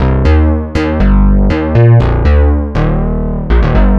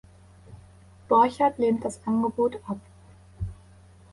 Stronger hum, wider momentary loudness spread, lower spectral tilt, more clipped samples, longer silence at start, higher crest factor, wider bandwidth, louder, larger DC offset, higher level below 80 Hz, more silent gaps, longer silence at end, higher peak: neither; second, 6 LU vs 17 LU; first, -9.5 dB/octave vs -7 dB/octave; neither; second, 0 s vs 0.5 s; second, 8 dB vs 18 dB; second, 6.4 kHz vs 11.5 kHz; first, -11 LUFS vs -25 LUFS; neither; first, -12 dBFS vs -50 dBFS; neither; second, 0 s vs 0.6 s; first, 0 dBFS vs -8 dBFS